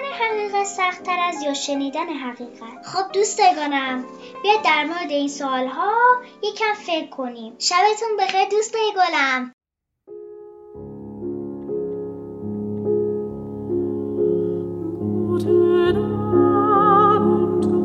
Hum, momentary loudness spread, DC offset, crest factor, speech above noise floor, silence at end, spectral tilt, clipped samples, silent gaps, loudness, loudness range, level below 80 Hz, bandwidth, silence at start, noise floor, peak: none; 16 LU; under 0.1%; 18 dB; 31 dB; 0 s; -4.5 dB/octave; under 0.1%; 9.53-9.58 s; -20 LUFS; 9 LU; -54 dBFS; 8 kHz; 0 s; -52 dBFS; -4 dBFS